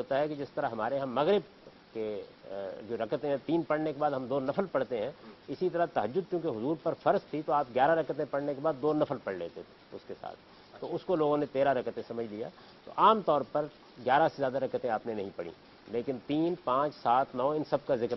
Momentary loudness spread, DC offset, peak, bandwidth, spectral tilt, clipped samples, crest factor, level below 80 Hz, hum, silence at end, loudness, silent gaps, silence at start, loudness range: 15 LU; under 0.1%; -10 dBFS; 6 kHz; -8 dB/octave; under 0.1%; 22 dB; -70 dBFS; none; 0 s; -31 LUFS; none; 0 s; 4 LU